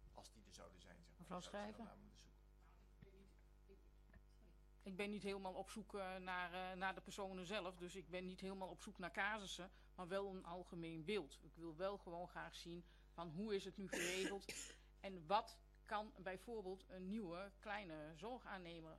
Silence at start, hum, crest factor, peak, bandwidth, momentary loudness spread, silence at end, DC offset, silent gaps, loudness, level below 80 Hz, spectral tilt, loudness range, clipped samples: 0 s; 50 Hz at -70 dBFS; 24 dB; -28 dBFS; 13 kHz; 18 LU; 0 s; under 0.1%; none; -50 LUFS; -68 dBFS; -4 dB/octave; 11 LU; under 0.1%